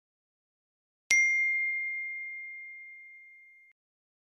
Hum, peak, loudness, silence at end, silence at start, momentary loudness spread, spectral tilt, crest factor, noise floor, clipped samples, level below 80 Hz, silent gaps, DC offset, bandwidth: none; -6 dBFS; -27 LUFS; 1 s; 1.1 s; 23 LU; 3.5 dB/octave; 28 dB; -56 dBFS; under 0.1%; -82 dBFS; none; under 0.1%; 14.5 kHz